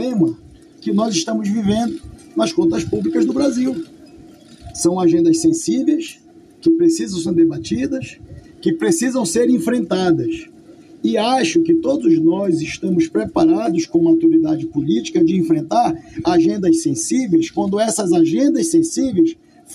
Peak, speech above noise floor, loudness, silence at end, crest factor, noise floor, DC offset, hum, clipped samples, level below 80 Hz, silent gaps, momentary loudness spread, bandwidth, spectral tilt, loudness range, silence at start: -6 dBFS; 26 dB; -17 LUFS; 0 s; 12 dB; -42 dBFS; under 0.1%; none; under 0.1%; -50 dBFS; none; 8 LU; 12.5 kHz; -5.5 dB/octave; 3 LU; 0 s